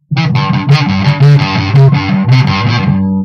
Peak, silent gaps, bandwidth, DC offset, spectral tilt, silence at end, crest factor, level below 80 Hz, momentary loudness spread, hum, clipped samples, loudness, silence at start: 0 dBFS; none; 6.6 kHz; under 0.1%; -7.5 dB/octave; 0 s; 8 dB; -40 dBFS; 4 LU; none; 1%; -9 LUFS; 0.1 s